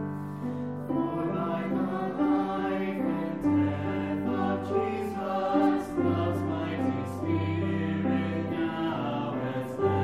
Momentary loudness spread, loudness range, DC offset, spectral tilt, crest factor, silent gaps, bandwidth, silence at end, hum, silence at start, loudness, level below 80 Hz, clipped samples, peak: 5 LU; 2 LU; 0.1%; -8.5 dB/octave; 16 dB; none; 13 kHz; 0 s; none; 0 s; -29 LUFS; -62 dBFS; under 0.1%; -14 dBFS